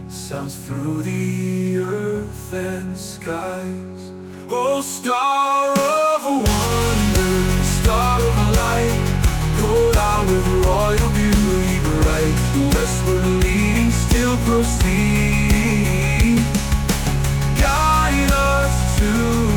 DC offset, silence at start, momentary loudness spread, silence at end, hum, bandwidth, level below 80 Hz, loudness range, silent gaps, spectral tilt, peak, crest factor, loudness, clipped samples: under 0.1%; 0 s; 10 LU; 0 s; none; 19.5 kHz; -24 dBFS; 7 LU; none; -5.5 dB/octave; -6 dBFS; 12 dB; -18 LUFS; under 0.1%